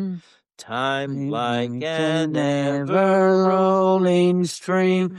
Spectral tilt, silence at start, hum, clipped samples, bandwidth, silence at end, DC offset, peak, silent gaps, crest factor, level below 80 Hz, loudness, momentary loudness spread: -6.5 dB/octave; 0 s; none; under 0.1%; 12 kHz; 0 s; under 0.1%; -8 dBFS; none; 12 dB; -68 dBFS; -20 LUFS; 8 LU